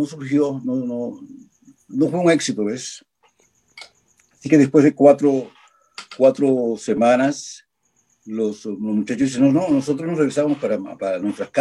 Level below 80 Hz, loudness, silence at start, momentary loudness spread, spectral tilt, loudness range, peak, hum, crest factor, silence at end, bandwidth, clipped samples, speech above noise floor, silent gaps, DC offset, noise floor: -66 dBFS; -19 LUFS; 0 s; 17 LU; -6 dB/octave; 6 LU; -2 dBFS; none; 18 dB; 0 s; 11 kHz; under 0.1%; 47 dB; none; under 0.1%; -65 dBFS